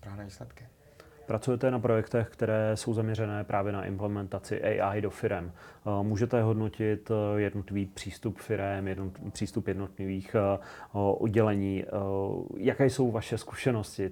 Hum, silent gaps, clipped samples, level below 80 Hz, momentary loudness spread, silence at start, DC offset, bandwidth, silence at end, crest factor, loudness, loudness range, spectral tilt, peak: none; none; under 0.1%; -60 dBFS; 10 LU; 0.05 s; under 0.1%; 15.5 kHz; 0 s; 20 dB; -31 LUFS; 4 LU; -7 dB/octave; -10 dBFS